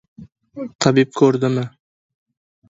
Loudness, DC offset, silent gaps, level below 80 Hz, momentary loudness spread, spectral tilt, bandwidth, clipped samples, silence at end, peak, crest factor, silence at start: -17 LUFS; under 0.1%; 0.75-0.79 s; -58 dBFS; 17 LU; -6 dB/octave; 8 kHz; under 0.1%; 1 s; 0 dBFS; 20 dB; 0.2 s